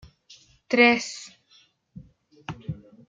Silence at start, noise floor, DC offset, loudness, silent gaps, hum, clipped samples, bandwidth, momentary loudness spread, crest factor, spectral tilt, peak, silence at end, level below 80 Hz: 0.7 s; -61 dBFS; under 0.1%; -21 LUFS; none; none; under 0.1%; 9.4 kHz; 24 LU; 24 dB; -4 dB/octave; -4 dBFS; 0.35 s; -60 dBFS